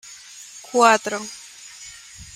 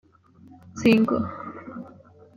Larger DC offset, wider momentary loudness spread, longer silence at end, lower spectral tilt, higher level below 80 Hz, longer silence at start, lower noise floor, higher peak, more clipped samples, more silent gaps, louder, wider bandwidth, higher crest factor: neither; about the same, 23 LU vs 23 LU; second, 0.1 s vs 0.5 s; second, -2 dB/octave vs -6.5 dB/octave; about the same, -60 dBFS vs -60 dBFS; second, 0.1 s vs 0.65 s; second, -42 dBFS vs -52 dBFS; first, -2 dBFS vs -8 dBFS; neither; neither; first, -19 LUFS vs -22 LUFS; first, 16 kHz vs 14.5 kHz; about the same, 22 dB vs 18 dB